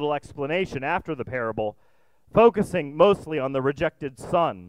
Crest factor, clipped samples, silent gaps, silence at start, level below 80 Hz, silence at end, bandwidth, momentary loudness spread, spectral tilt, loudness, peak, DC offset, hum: 20 dB; under 0.1%; none; 0 s; -52 dBFS; 0 s; 12.5 kHz; 11 LU; -6.5 dB/octave; -24 LUFS; -4 dBFS; 0.1%; none